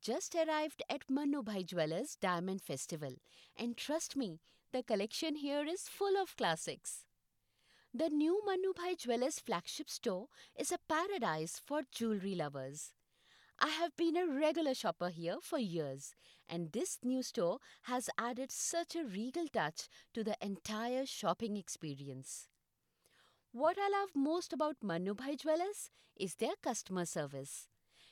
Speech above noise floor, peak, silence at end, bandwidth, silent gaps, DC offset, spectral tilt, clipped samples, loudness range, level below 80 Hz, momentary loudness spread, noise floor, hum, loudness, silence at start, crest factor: 44 dB; -14 dBFS; 0.45 s; 18 kHz; none; under 0.1%; -4 dB/octave; under 0.1%; 3 LU; -80 dBFS; 11 LU; -83 dBFS; none; -39 LUFS; 0 s; 24 dB